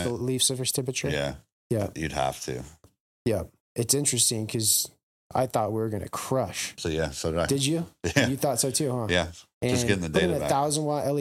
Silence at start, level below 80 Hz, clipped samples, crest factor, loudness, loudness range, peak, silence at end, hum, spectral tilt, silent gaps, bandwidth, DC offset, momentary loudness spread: 0 s; -50 dBFS; under 0.1%; 24 dB; -26 LUFS; 3 LU; -2 dBFS; 0 s; none; -3.5 dB/octave; 1.52-1.70 s, 3.00-3.25 s, 3.60-3.75 s, 5.03-5.30 s, 9.53-9.61 s; 16.5 kHz; under 0.1%; 9 LU